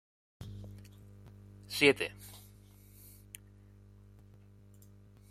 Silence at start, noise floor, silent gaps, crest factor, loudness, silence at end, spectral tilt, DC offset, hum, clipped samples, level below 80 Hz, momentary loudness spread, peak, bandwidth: 0.4 s; -58 dBFS; none; 28 dB; -29 LUFS; 2.9 s; -4 dB/octave; under 0.1%; 50 Hz at -55 dBFS; under 0.1%; -62 dBFS; 29 LU; -10 dBFS; 15.5 kHz